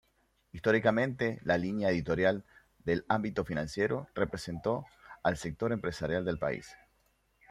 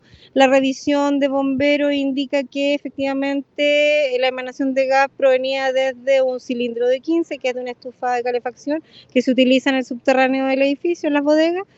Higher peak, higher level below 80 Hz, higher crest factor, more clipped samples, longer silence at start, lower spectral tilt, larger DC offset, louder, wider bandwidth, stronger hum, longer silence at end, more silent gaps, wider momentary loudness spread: second, -12 dBFS vs 0 dBFS; first, -58 dBFS vs -64 dBFS; about the same, 22 dB vs 18 dB; neither; first, 0.55 s vs 0.35 s; first, -6.5 dB/octave vs -3.5 dB/octave; neither; second, -32 LUFS vs -18 LUFS; first, 14 kHz vs 8 kHz; neither; first, 0.75 s vs 0.15 s; neither; about the same, 8 LU vs 8 LU